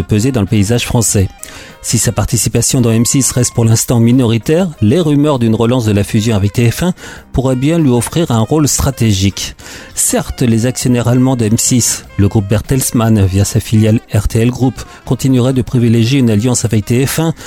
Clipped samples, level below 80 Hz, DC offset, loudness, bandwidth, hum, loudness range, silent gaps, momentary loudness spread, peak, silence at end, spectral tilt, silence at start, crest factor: under 0.1%; -30 dBFS; under 0.1%; -12 LUFS; 17 kHz; none; 2 LU; none; 6 LU; 0 dBFS; 0 s; -5.5 dB/octave; 0 s; 10 dB